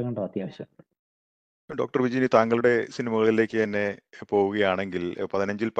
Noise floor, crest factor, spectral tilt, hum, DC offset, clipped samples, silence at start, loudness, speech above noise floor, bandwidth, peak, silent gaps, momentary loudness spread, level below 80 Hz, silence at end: under -90 dBFS; 22 dB; -6.5 dB/octave; none; under 0.1%; under 0.1%; 0 s; -25 LUFS; over 65 dB; 8.4 kHz; -4 dBFS; 0.99-1.68 s; 14 LU; -68 dBFS; 0 s